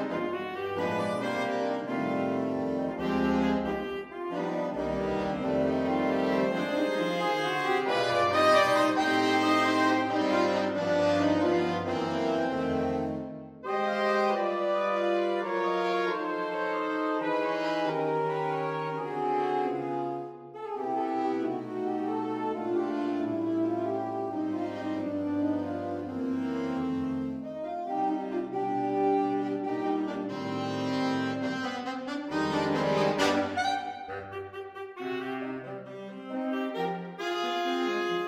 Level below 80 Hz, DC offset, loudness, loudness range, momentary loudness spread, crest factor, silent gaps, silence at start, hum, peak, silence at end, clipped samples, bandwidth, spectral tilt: -62 dBFS; under 0.1%; -29 LUFS; 7 LU; 10 LU; 18 dB; none; 0 s; none; -12 dBFS; 0 s; under 0.1%; 15.5 kHz; -5.5 dB/octave